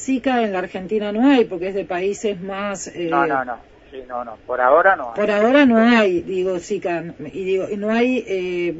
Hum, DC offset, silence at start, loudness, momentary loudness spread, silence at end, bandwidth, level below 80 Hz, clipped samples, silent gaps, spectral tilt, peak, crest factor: none; under 0.1%; 0 s; -19 LUFS; 16 LU; 0 s; 8 kHz; -54 dBFS; under 0.1%; none; -5 dB/octave; -2 dBFS; 18 dB